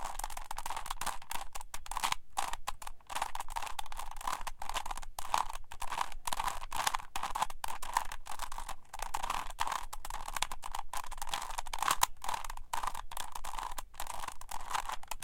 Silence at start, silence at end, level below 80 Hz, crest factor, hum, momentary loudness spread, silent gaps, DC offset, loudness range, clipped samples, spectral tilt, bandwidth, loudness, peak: 0 s; 0 s; -46 dBFS; 28 dB; none; 8 LU; none; under 0.1%; 3 LU; under 0.1%; -0.5 dB/octave; 17 kHz; -39 LUFS; -8 dBFS